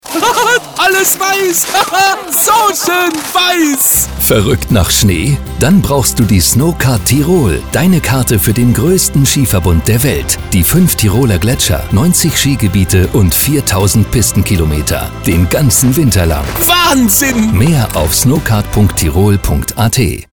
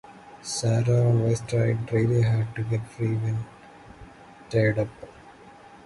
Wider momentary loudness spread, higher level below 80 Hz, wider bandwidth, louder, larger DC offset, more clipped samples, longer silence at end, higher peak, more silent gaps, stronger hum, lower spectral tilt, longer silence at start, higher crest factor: second, 4 LU vs 12 LU; first, -24 dBFS vs -52 dBFS; first, over 20 kHz vs 11.5 kHz; first, -10 LUFS vs -25 LUFS; first, 0.7% vs under 0.1%; neither; about the same, 0.1 s vs 0.1 s; first, 0 dBFS vs -10 dBFS; neither; neither; second, -4 dB/octave vs -6.5 dB/octave; about the same, 0.05 s vs 0.1 s; second, 10 dB vs 16 dB